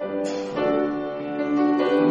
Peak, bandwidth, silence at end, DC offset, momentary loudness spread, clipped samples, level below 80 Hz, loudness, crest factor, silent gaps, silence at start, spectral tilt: -8 dBFS; 7.8 kHz; 0 s; under 0.1%; 8 LU; under 0.1%; -60 dBFS; -24 LUFS; 14 dB; none; 0 s; -6.5 dB/octave